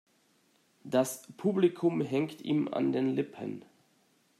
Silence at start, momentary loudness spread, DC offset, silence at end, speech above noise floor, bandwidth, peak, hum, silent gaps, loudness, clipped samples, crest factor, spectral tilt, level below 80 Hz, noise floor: 0.85 s; 10 LU; under 0.1%; 0.8 s; 39 dB; 15 kHz; -14 dBFS; none; none; -31 LUFS; under 0.1%; 18 dB; -6 dB/octave; -80 dBFS; -69 dBFS